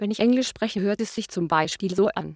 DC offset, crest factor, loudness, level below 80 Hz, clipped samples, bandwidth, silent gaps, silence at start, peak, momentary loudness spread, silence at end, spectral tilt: under 0.1%; 18 dB; -24 LUFS; -58 dBFS; under 0.1%; 8 kHz; none; 0 s; -6 dBFS; 7 LU; 0 s; -5 dB/octave